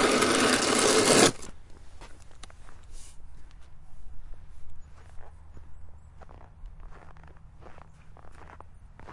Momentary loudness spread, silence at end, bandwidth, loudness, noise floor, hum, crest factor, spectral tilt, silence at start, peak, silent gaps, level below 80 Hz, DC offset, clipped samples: 17 LU; 0 s; 11.5 kHz; -21 LUFS; -47 dBFS; none; 26 dB; -2.5 dB/octave; 0 s; -4 dBFS; none; -48 dBFS; under 0.1%; under 0.1%